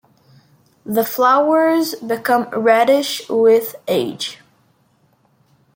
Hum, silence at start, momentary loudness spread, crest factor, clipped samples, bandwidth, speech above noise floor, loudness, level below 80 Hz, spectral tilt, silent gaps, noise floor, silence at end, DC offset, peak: none; 0.85 s; 9 LU; 16 dB; under 0.1%; 17 kHz; 43 dB; -16 LUFS; -68 dBFS; -4 dB/octave; none; -59 dBFS; 1.4 s; under 0.1%; -2 dBFS